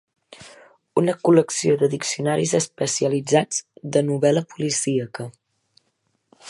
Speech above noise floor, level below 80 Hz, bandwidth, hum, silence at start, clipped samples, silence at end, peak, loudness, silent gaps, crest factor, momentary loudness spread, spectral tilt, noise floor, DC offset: 50 dB; -68 dBFS; 11.5 kHz; none; 0.3 s; under 0.1%; 0 s; -2 dBFS; -21 LUFS; none; 20 dB; 9 LU; -4.5 dB/octave; -71 dBFS; under 0.1%